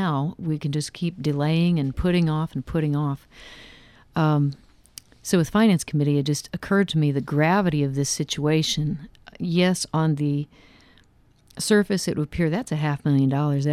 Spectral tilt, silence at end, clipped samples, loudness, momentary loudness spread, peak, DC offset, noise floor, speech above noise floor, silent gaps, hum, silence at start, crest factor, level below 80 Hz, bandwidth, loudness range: -6 dB/octave; 0 s; under 0.1%; -23 LUFS; 9 LU; -6 dBFS; under 0.1%; -57 dBFS; 35 dB; none; none; 0 s; 16 dB; -46 dBFS; 14 kHz; 3 LU